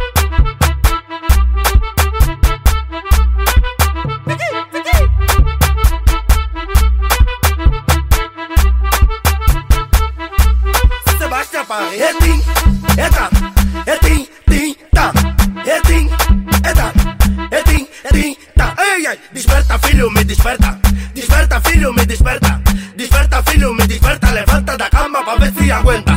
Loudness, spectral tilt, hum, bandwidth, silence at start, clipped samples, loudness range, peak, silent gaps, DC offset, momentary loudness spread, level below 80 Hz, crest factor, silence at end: -14 LUFS; -5 dB/octave; none; 16.5 kHz; 0 s; under 0.1%; 2 LU; 0 dBFS; none; 0.4%; 4 LU; -12 dBFS; 12 dB; 0 s